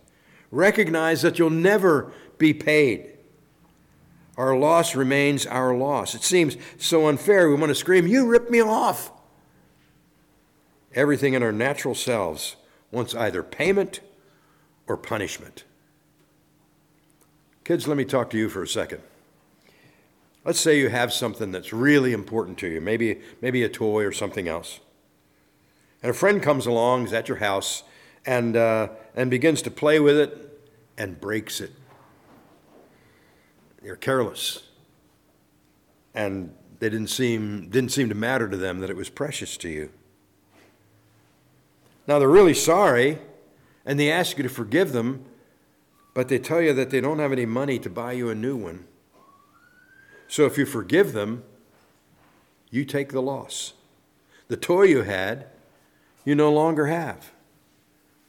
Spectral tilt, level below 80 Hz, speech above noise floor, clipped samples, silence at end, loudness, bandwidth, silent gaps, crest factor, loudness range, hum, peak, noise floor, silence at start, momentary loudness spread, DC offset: -4.5 dB/octave; -60 dBFS; 40 dB; under 0.1%; 1 s; -22 LUFS; 18.5 kHz; none; 18 dB; 11 LU; none; -6 dBFS; -62 dBFS; 0.5 s; 15 LU; under 0.1%